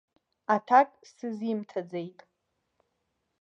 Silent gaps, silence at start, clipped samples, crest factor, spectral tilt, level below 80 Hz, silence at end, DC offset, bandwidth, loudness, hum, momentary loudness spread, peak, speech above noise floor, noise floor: none; 0.5 s; under 0.1%; 22 dB; -6.5 dB/octave; -86 dBFS; 1.3 s; under 0.1%; 7.4 kHz; -28 LUFS; none; 18 LU; -8 dBFS; 52 dB; -79 dBFS